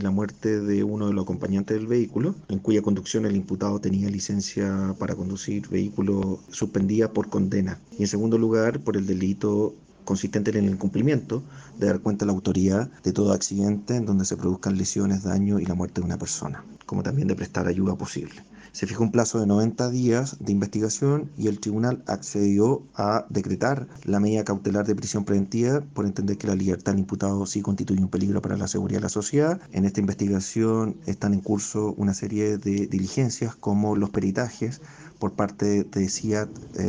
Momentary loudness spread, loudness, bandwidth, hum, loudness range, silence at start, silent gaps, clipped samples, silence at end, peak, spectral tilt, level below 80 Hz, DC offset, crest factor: 6 LU; -25 LUFS; 10 kHz; none; 2 LU; 0 s; none; under 0.1%; 0 s; -6 dBFS; -6 dB/octave; -56 dBFS; under 0.1%; 20 dB